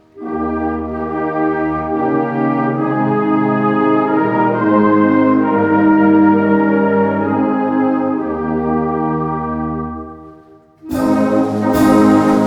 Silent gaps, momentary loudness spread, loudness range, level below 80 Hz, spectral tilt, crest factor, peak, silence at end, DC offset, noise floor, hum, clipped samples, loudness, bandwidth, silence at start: none; 10 LU; 6 LU; -44 dBFS; -8 dB/octave; 14 dB; 0 dBFS; 0 s; under 0.1%; -43 dBFS; none; under 0.1%; -15 LUFS; 16.5 kHz; 0.15 s